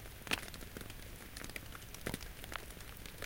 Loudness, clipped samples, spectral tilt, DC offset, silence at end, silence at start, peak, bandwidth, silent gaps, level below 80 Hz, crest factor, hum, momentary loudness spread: -45 LUFS; under 0.1%; -3 dB/octave; under 0.1%; 0 s; 0 s; -18 dBFS; 17 kHz; none; -54 dBFS; 28 dB; none; 10 LU